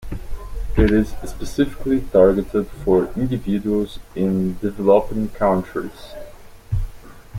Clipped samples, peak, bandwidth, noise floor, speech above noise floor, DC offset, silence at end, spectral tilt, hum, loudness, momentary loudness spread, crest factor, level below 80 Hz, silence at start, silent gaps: under 0.1%; -2 dBFS; 16.5 kHz; -39 dBFS; 20 dB; under 0.1%; 0 s; -8 dB/octave; none; -20 LUFS; 18 LU; 18 dB; -30 dBFS; 0 s; none